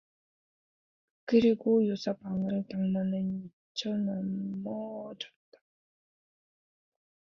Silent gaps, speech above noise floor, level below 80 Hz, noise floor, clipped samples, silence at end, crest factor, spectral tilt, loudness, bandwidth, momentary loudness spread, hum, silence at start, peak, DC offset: 3.53-3.75 s; over 60 dB; -70 dBFS; under -90 dBFS; under 0.1%; 2 s; 20 dB; -7.5 dB/octave; -31 LUFS; 7.2 kHz; 15 LU; none; 1.25 s; -12 dBFS; under 0.1%